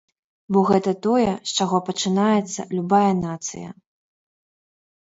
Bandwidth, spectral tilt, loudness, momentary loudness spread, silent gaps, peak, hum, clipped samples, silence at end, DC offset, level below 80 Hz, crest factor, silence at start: 8 kHz; -5 dB/octave; -21 LUFS; 11 LU; none; -4 dBFS; none; under 0.1%; 1.35 s; under 0.1%; -58 dBFS; 18 dB; 0.5 s